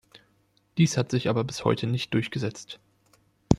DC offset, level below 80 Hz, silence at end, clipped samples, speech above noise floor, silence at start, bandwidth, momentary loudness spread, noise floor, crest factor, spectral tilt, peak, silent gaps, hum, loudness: under 0.1%; -54 dBFS; 0 s; under 0.1%; 41 dB; 0.15 s; 13 kHz; 16 LU; -67 dBFS; 26 dB; -6 dB/octave; -2 dBFS; none; none; -27 LUFS